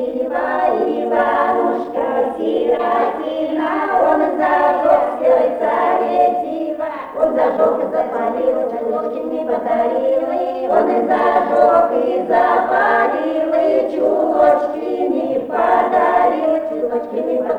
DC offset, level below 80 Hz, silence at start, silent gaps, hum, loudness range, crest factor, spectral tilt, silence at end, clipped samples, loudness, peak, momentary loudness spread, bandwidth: under 0.1%; -54 dBFS; 0 s; none; none; 3 LU; 14 dB; -6.5 dB/octave; 0 s; under 0.1%; -16 LUFS; -2 dBFS; 7 LU; 9 kHz